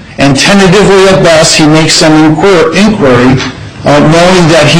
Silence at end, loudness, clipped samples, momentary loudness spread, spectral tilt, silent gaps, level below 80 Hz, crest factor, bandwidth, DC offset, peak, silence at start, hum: 0 s; -4 LUFS; 2%; 5 LU; -4.5 dB/octave; none; -28 dBFS; 4 dB; 16.5 kHz; under 0.1%; 0 dBFS; 0 s; none